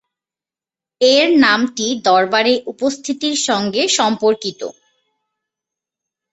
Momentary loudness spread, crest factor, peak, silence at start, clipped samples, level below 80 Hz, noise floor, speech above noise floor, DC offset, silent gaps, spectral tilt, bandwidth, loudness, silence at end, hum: 10 LU; 16 dB; 0 dBFS; 1 s; under 0.1%; -62 dBFS; -90 dBFS; 75 dB; under 0.1%; none; -2.5 dB/octave; 8.2 kHz; -15 LUFS; 1.6 s; none